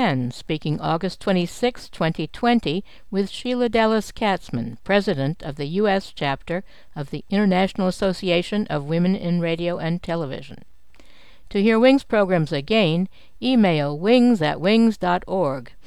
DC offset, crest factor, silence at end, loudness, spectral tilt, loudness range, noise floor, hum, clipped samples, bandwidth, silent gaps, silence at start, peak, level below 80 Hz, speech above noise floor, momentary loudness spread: 1%; 18 dB; 0.2 s; -21 LUFS; -6.5 dB/octave; 5 LU; -52 dBFS; none; under 0.1%; 12.5 kHz; none; 0 s; -4 dBFS; -48 dBFS; 31 dB; 10 LU